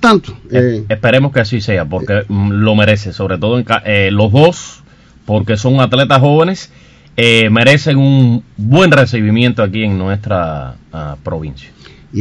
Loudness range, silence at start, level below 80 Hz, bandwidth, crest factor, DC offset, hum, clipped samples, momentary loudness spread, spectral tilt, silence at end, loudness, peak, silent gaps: 3 LU; 0 s; -40 dBFS; 11 kHz; 12 dB; under 0.1%; none; 0.9%; 14 LU; -6.5 dB/octave; 0 s; -11 LUFS; 0 dBFS; none